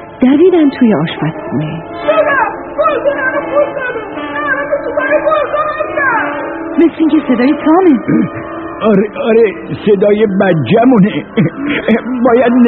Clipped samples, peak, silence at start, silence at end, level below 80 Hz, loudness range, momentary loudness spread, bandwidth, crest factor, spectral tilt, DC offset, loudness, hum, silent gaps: under 0.1%; 0 dBFS; 0 s; 0 s; -46 dBFS; 3 LU; 10 LU; 4.4 kHz; 10 dB; -5.5 dB/octave; 0.1%; -12 LUFS; none; none